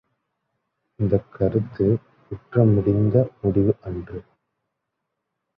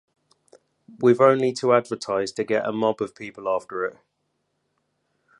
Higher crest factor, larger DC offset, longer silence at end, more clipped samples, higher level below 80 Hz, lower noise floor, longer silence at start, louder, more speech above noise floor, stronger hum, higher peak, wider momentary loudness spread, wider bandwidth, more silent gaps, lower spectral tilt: about the same, 20 dB vs 22 dB; neither; second, 1.35 s vs 1.5 s; neither; first, -44 dBFS vs -70 dBFS; first, -80 dBFS vs -74 dBFS; about the same, 1 s vs 1 s; about the same, -22 LUFS vs -23 LUFS; first, 59 dB vs 52 dB; neither; about the same, -4 dBFS vs -4 dBFS; first, 17 LU vs 13 LU; second, 3.6 kHz vs 11 kHz; neither; first, -13 dB/octave vs -5.5 dB/octave